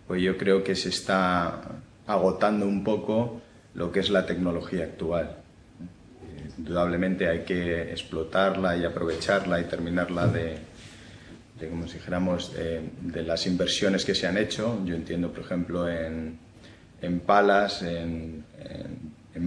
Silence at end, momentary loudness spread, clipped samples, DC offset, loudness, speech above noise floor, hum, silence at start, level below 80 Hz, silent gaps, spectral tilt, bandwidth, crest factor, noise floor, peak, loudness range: 0 s; 18 LU; under 0.1%; under 0.1%; -27 LUFS; 24 dB; none; 0.1 s; -50 dBFS; none; -5.5 dB/octave; 10.5 kHz; 20 dB; -50 dBFS; -6 dBFS; 4 LU